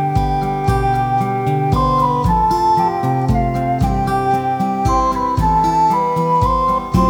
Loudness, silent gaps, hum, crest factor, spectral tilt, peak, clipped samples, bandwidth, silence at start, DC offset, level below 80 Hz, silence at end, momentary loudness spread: -16 LUFS; none; none; 14 dB; -7.5 dB/octave; -2 dBFS; under 0.1%; 19 kHz; 0 s; under 0.1%; -26 dBFS; 0 s; 3 LU